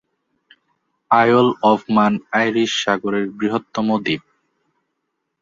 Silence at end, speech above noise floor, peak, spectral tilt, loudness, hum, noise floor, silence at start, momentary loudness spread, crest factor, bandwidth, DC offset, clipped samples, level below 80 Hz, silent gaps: 1.2 s; 58 dB; -2 dBFS; -5 dB/octave; -18 LUFS; none; -75 dBFS; 1.1 s; 8 LU; 18 dB; 7.6 kHz; under 0.1%; under 0.1%; -62 dBFS; none